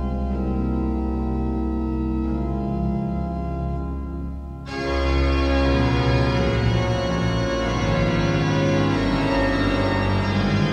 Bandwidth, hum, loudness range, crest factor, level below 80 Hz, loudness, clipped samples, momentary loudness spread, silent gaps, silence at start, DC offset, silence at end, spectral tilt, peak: 8.8 kHz; none; 5 LU; 14 dB; -28 dBFS; -22 LUFS; under 0.1%; 7 LU; none; 0 s; under 0.1%; 0 s; -7 dB/octave; -8 dBFS